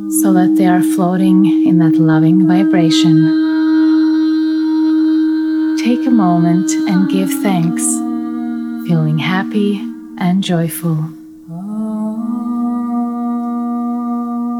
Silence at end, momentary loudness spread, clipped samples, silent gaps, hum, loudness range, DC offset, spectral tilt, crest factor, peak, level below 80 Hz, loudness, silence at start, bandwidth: 0 s; 9 LU; under 0.1%; none; none; 8 LU; under 0.1%; -6 dB/octave; 12 dB; 0 dBFS; -62 dBFS; -14 LUFS; 0 s; 16 kHz